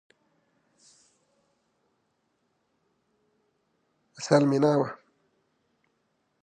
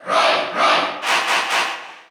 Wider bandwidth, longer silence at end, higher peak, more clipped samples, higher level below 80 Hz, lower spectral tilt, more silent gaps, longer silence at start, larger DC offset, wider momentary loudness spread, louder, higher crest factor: second, 9.8 kHz vs over 20 kHz; first, 1.45 s vs 0.1 s; about the same, -6 dBFS vs -4 dBFS; neither; about the same, -82 dBFS vs -82 dBFS; first, -6.5 dB/octave vs -0.5 dB/octave; neither; first, 4.2 s vs 0 s; neither; first, 13 LU vs 5 LU; second, -24 LUFS vs -17 LUFS; first, 26 dB vs 16 dB